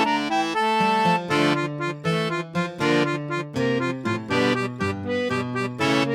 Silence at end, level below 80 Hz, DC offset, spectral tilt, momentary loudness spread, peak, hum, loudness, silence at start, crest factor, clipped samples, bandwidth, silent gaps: 0 s; -62 dBFS; under 0.1%; -5.5 dB/octave; 7 LU; -8 dBFS; none; -23 LUFS; 0 s; 16 dB; under 0.1%; 15 kHz; none